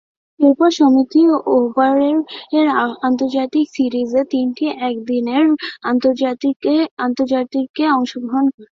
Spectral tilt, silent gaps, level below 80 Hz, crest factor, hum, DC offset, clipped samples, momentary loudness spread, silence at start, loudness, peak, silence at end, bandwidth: -5 dB/octave; 6.56-6.60 s, 6.91-6.97 s, 7.69-7.74 s, 8.54-8.58 s; -62 dBFS; 14 dB; none; under 0.1%; under 0.1%; 7 LU; 0.4 s; -16 LUFS; -2 dBFS; 0.1 s; 7.2 kHz